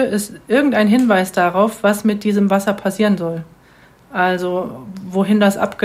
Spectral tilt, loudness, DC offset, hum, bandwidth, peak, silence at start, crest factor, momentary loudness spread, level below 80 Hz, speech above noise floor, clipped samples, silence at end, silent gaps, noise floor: -6 dB/octave; -16 LUFS; under 0.1%; none; 16 kHz; 0 dBFS; 0 s; 16 dB; 10 LU; -56 dBFS; 32 dB; under 0.1%; 0 s; none; -48 dBFS